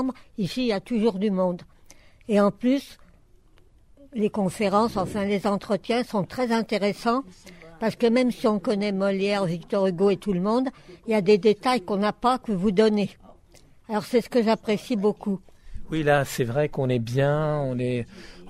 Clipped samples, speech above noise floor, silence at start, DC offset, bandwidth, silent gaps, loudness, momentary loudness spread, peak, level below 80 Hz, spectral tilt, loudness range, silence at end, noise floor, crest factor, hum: under 0.1%; 31 dB; 0 s; under 0.1%; 15 kHz; none; -24 LUFS; 9 LU; -8 dBFS; -50 dBFS; -6.5 dB/octave; 3 LU; 0 s; -55 dBFS; 16 dB; none